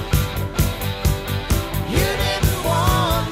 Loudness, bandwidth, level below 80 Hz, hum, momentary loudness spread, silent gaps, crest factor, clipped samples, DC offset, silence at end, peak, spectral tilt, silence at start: -20 LUFS; 16.5 kHz; -26 dBFS; none; 4 LU; none; 16 dB; under 0.1%; under 0.1%; 0 s; -4 dBFS; -5 dB/octave; 0 s